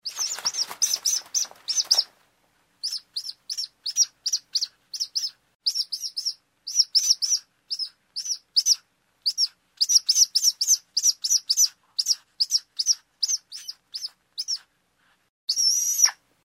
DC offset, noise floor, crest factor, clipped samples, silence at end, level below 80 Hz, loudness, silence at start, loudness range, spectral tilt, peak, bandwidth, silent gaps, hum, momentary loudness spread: under 0.1%; -66 dBFS; 22 dB; under 0.1%; 0.3 s; -84 dBFS; -22 LUFS; 0.05 s; 6 LU; 5.5 dB/octave; -4 dBFS; 16 kHz; 5.55-5.60 s, 15.29-15.48 s; none; 14 LU